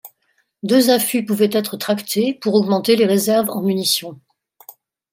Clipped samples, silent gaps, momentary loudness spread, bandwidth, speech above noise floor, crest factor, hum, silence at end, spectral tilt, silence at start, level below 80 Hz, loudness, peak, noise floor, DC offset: under 0.1%; none; 7 LU; 16.5 kHz; 49 dB; 16 dB; none; 0.4 s; -4.5 dB/octave; 0.05 s; -68 dBFS; -17 LUFS; -2 dBFS; -66 dBFS; under 0.1%